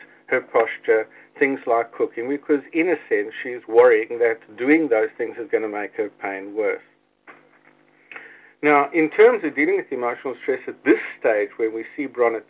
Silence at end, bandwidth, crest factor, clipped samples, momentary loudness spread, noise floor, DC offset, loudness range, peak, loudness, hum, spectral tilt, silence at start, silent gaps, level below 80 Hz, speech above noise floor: 0.05 s; 4 kHz; 20 dB; under 0.1%; 13 LU; -56 dBFS; under 0.1%; 6 LU; -2 dBFS; -21 LUFS; none; -8.5 dB/octave; 0.3 s; none; -76 dBFS; 35 dB